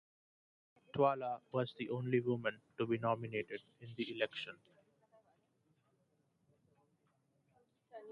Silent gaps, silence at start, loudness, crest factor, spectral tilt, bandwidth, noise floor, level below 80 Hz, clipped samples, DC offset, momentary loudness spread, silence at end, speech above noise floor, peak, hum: none; 0.95 s; -39 LUFS; 24 dB; -8 dB/octave; 7 kHz; -78 dBFS; -80 dBFS; under 0.1%; under 0.1%; 15 LU; 0 s; 40 dB; -18 dBFS; none